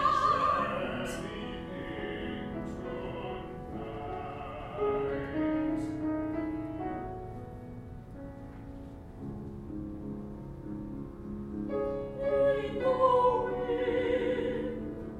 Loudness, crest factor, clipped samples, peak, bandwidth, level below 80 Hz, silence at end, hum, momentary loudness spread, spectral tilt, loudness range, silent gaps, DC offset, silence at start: -33 LUFS; 20 dB; under 0.1%; -14 dBFS; 13 kHz; -50 dBFS; 0 s; none; 17 LU; -7 dB/octave; 13 LU; none; under 0.1%; 0 s